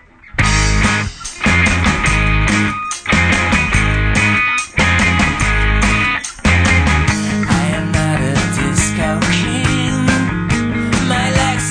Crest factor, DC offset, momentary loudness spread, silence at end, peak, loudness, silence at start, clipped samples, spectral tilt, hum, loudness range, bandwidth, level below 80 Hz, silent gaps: 14 dB; under 0.1%; 5 LU; 0 s; 0 dBFS; -14 LUFS; 0.25 s; under 0.1%; -4.5 dB/octave; none; 2 LU; 10.5 kHz; -22 dBFS; none